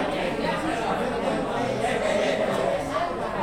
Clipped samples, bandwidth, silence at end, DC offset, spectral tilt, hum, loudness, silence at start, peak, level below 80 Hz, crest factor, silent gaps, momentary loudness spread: under 0.1%; 16.5 kHz; 0 s; under 0.1%; -5 dB/octave; none; -26 LUFS; 0 s; -12 dBFS; -48 dBFS; 14 dB; none; 3 LU